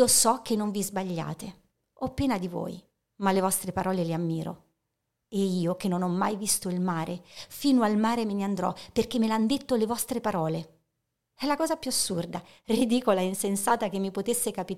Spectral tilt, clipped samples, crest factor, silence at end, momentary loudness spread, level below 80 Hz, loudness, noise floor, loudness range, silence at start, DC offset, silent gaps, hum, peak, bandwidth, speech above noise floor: -4.5 dB/octave; under 0.1%; 18 dB; 0 s; 12 LU; -58 dBFS; -28 LUFS; -82 dBFS; 3 LU; 0 s; 0.2%; none; none; -10 dBFS; 16.5 kHz; 54 dB